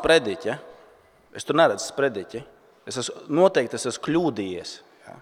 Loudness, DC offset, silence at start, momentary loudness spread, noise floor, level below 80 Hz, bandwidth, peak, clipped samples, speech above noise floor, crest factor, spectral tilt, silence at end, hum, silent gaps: -24 LUFS; under 0.1%; 0 s; 18 LU; -55 dBFS; -58 dBFS; 15.5 kHz; -4 dBFS; under 0.1%; 32 dB; 20 dB; -4 dB/octave; 0 s; none; none